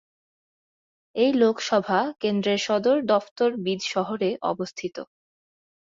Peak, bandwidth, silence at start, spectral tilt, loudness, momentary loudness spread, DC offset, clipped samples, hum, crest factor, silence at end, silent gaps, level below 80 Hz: -8 dBFS; 7.6 kHz; 1.15 s; -5 dB/octave; -24 LUFS; 12 LU; under 0.1%; under 0.1%; none; 18 dB; 0.9 s; 3.31-3.36 s; -70 dBFS